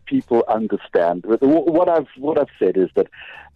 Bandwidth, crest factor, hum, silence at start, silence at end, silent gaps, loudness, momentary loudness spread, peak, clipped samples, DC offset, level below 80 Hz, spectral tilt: 5.4 kHz; 12 dB; none; 0.05 s; 0.2 s; none; -19 LUFS; 6 LU; -8 dBFS; under 0.1%; under 0.1%; -58 dBFS; -9 dB/octave